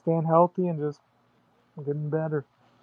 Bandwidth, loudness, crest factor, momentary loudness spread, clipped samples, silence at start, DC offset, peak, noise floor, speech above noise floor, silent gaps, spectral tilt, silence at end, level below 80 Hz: 5 kHz; -27 LUFS; 20 dB; 12 LU; under 0.1%; 0.05 s; under 0.1%; -8 dBFS; -65 dBFS; 40 dB; none; -11.5 dB/octave; 0.4 s; -78 dBFS